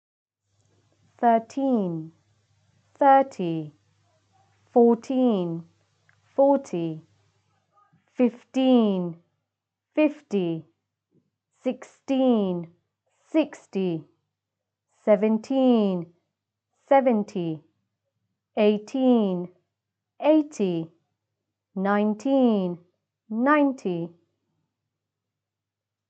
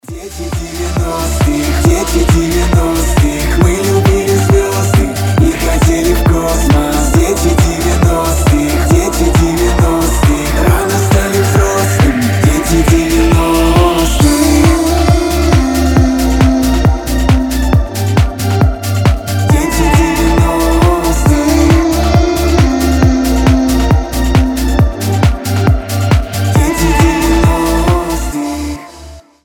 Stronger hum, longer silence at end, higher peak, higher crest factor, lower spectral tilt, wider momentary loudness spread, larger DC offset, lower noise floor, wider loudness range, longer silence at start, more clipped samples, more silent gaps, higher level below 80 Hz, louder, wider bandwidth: neither; first, 2 s vs 0.25 s; second, -6 dBFS vs 0 dBFS; first, 20 dB vs 10 dB; first, -7.5 dB/octave vs -5.5 dB/octave; first, 15 LU vs 3 LU; neither; first, -87 dBFS vs -33 dBFS; about the same, 4 LU vs 2 LU; first, 1.2 s vs 0.1 s; neither; neither; second, -86 dBFS vs -16 dBFS; second, -24 LUFS vs -11 LUFS; second, 8.2 kHz vs 18.5 kHz